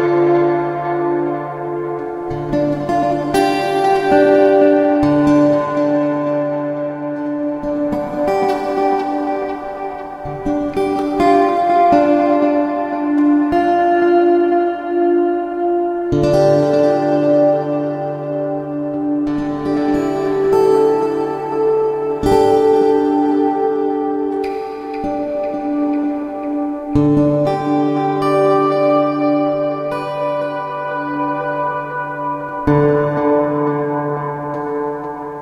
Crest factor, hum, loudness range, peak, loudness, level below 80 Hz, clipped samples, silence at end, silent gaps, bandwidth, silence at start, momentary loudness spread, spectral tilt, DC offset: 14 dB; none; 5 LU; 0 dBFS; -16 LUFS; -44 dBFS; under 0.1%; 0 s; none; 11.5 kHz; 0 s; 10 LU; -7.5 dB/octave; under 0.1%